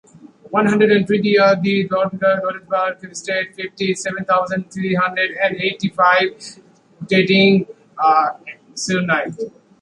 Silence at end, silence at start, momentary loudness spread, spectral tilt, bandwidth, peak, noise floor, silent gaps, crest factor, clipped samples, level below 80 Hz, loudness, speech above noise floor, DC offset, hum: 0.35 s; 0.5 s; 13 LU; -5 dB/octave; 11 kHz; -2 dBFS; -39 dBFS; none; 16 dB; under 0.1%; -60 dBFS; -17 LUFS; 22 dB; under 0.1%; none